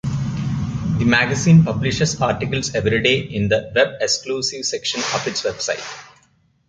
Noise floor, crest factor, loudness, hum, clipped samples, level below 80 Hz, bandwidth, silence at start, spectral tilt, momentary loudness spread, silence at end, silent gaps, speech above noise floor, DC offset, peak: -59 dBFS; 18 dB; -19 LUFS; none; under 0.1%; -42 dBFS; 9.4 kHz; 0.05 s; -4.5 dB/octave; 10 LU; 0.65 s; none; 40 dB; under 0.1%; 0 dBFS